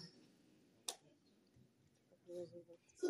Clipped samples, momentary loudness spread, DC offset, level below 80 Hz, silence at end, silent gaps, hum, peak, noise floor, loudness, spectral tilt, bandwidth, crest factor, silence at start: under 0.1%; 17 LU; under 0.1%; under -90 dBFS; 0 s; none; none; -26 dBFS; -74 dBFS; -53 LUFS; -3.5 dB/octave; 15 kHz; 26 dB; 0 s